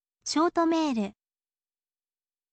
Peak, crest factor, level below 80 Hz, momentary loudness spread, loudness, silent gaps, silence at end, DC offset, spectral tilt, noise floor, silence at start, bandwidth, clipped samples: -14 dBFS; 16 dB; -70 dBFS; 8 LU; -27 LUFS; none; 1.4 s; under 0.1%; -4 dB/octave; under -90 dBFS; 0.25 s; 8.8 kHz; under 0.1%